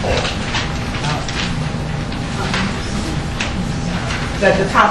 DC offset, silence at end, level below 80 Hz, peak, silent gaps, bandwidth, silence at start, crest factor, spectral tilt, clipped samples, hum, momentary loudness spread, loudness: under 0.1%; 0 s; -28 dBFS; 0 dBFS; none; 12 kHz; 0 s; 18 dB; -5 dB/octave; under 0.1%; none; 7 LU; -19 LUFS